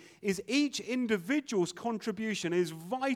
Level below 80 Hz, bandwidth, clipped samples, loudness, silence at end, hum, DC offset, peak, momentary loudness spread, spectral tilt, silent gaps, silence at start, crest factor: -74 dBFS; 16 kHz; under 0.1%; -32 LUFS; 0 s; none; under 0.1%; -18 dBFS; 5 LU; -4.5 dB/octave; none; 0 s; 14 dB